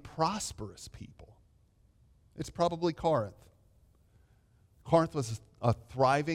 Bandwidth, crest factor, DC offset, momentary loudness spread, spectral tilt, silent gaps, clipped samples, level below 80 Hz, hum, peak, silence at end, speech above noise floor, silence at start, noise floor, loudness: 16 kHz; 22 dB; under 0.1%; 21 LU; -5.5 dB/octave; none; under 0.1%; -58 dBFS; none; -12 dBFS; 0 s; 35 dB; 0.05 s; -66 dBFS; -32 LUFS